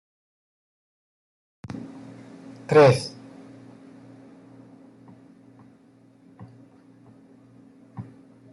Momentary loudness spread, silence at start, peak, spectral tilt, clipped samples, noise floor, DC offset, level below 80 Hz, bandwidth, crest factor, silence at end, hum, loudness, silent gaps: 32 LU; 1.75 s; -4 dBFS; -6.5 dB/octave; under 0.1%; -55 dBFS; under 0.1%; -68 dBFS; 12 kHz; 26 dB; 0.5 s; none; -19 LUFS; none